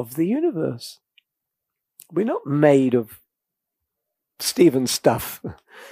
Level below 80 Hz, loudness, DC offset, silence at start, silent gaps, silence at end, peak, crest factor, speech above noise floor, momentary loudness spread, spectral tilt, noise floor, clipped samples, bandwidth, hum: -58 dBFS; -21 LUFS; under 0.1%; 0 s; none; 0.05 s; -2 dBFS; 22 dB; 63 dB; 19 LU; -5 dB/octave; -84 dBFS; under 0.1%; 15.5 kHz; none